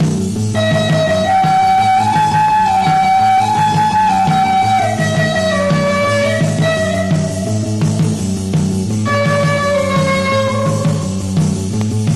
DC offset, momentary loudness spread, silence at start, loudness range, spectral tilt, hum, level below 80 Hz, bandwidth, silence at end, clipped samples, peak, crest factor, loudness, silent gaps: 0.7%; 5 LU; 0 s; 3 LU; -5.5 dB/octave; none; -38 dBFS; 13 kHz; 0 s; under 0.1%; -4 dBFS; 10 dB; -14 LUFS; none